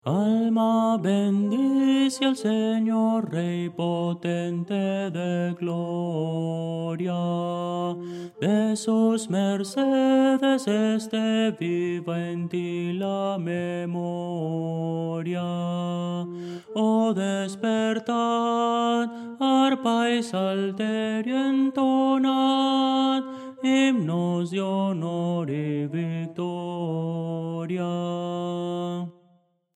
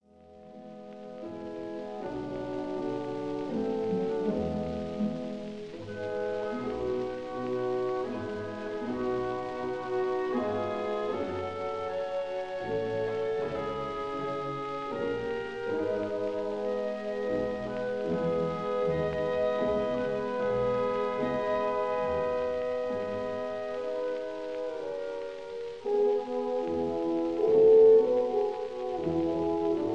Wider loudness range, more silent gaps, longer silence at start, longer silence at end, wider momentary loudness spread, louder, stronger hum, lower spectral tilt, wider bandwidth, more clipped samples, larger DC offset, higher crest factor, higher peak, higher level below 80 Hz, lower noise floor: second, 6 LU vs 9 LU; neither; about the same, 0.05 s vs 0.05 s; first, 0.65 s vs 0 s; about the same, 8 LU vs 8 LU; first, -25 LUFS vs -31 LUFS; neither; about the same, -6.5 dB/octave vs -7 dB/octave; first, 12 kHz vs 8.2 kHz; neither; second, under 0.1% vs 0.2%; about the same, 16 dB vs 18 dB; about the same, -10 dBFS vs -12 dBFS; second, -78 dBFS vs -58 dBFS; first, -63 dBFS vs -53 dBFS